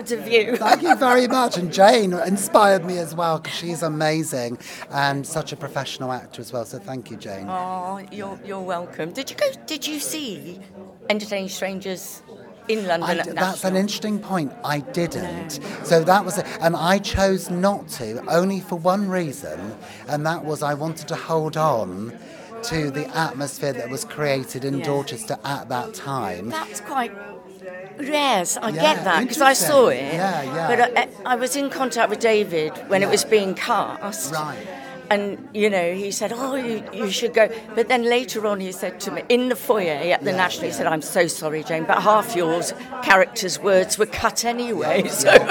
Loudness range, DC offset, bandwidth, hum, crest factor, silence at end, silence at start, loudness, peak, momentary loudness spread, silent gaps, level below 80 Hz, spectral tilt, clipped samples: 9 LU; under 0.1%; 17.5 kHz; none; 22 dB; 0 s; 0 s; -21 LUFS; 0 dBFS; 14 LU; none; -52 dBFS; -4 dB/octave; under 0.1%